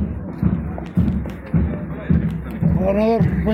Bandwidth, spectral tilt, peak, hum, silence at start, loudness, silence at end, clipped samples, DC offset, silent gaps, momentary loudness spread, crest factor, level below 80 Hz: 5.8 kHz; -10.5 dB/octave; -4 dBFS; none; 0 s; -20 LUFS; 0 s; under 0.1%; under 0.1%; none; 8 LU; 14 dB; -28 dBFS